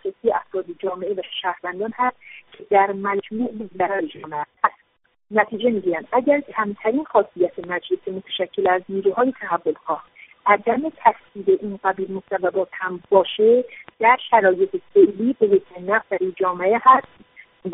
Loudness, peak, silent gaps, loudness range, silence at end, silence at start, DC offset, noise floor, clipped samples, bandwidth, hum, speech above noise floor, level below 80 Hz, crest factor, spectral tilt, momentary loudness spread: -21 LUFS; 0 dBFS; none; 6 LU; 0 s; 0.05 s; under 0.1%; -64 dBFS; under 0.1%; 3.9 kHz; none; 44 dB; -66 dBFS; 20 dB; -3 dB/octave; 11 LU